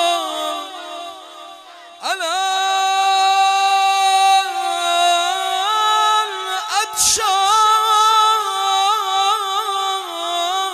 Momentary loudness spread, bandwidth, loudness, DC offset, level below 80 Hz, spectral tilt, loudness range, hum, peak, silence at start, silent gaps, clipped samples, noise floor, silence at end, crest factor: 11 LU; 16 kHz; -16 LUFS; under 0.1%; -60 dBFS; 1.5 dB/octave; 3 LU; none; -2 dBFS; 0 s; none; under 0.1%; -39 dBFS; 0 s; 14 dB